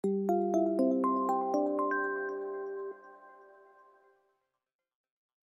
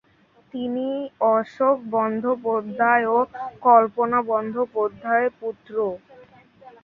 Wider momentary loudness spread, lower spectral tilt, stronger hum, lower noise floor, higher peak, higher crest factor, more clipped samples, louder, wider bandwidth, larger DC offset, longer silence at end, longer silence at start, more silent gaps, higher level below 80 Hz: about the same, 12 LU vs 12 LU; about the same, -8 dB/octave vs -8 dB/octave; neither; first, -79 dBFS vs -58 dBFS; second, -18 dBFS vs -2 dBFS; about the same, 16 dB vs 20 dB; neither; second, -31 LUFS vs -22 LUFS; first, 10.5 kHz vs 4.8 kHz; neither; first, 2.15 s vs 0.15 s; second, 0.05 s vs 0.55 s; neither; second, -88 dBFS vs -66 dBFS